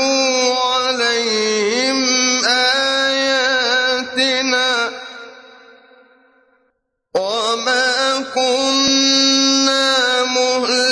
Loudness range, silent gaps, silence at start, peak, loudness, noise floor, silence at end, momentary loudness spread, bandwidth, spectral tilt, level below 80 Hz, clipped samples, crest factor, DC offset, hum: 7 LU; none; 0 s; -4 dBFS; -15 LUFS; -67 dBFS; 0 s; 6 LU; 11 kHz; -0.5 dB/octave; -64 dBFS; under 0.1%; 14 dB; under 0.1%; none